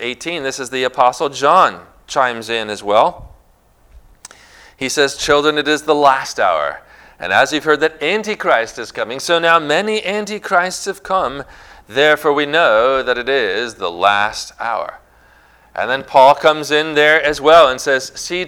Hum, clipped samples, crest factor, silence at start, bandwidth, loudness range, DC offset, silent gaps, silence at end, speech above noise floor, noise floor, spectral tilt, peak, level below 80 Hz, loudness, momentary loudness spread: none; 0.2%; 16 dB; 0 s; 18 kHz; 5 LU; under 0.1%; none; 0 s; 37 dB; -52 dBFS; -2.5 dB/octave; 0 dBFS; -48 dBFS; -15 LUFS; 12 LU